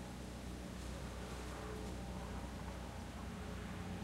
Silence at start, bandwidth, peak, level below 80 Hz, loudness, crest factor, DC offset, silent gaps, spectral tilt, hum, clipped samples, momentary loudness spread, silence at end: 0 s; 16 kHz; -34 dBFS; -52 dBFS; -48 LUFS; 12 dB; under 0.1%; none; -5.5 dB/octave; none; under 0.1%; 2 LU; 0 s